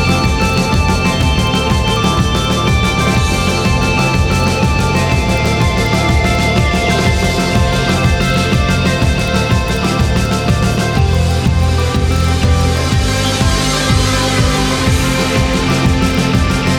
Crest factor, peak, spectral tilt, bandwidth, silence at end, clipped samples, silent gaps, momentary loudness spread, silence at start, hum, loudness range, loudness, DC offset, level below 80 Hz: 12 dB; -2 dBFS; -5 dB/octave; 19.5 kHz; 0 s; under 0.1%; none; 1 LU; 0 s; none; 1 LU; -13 LUFS; under 0.1%; -20 dBFS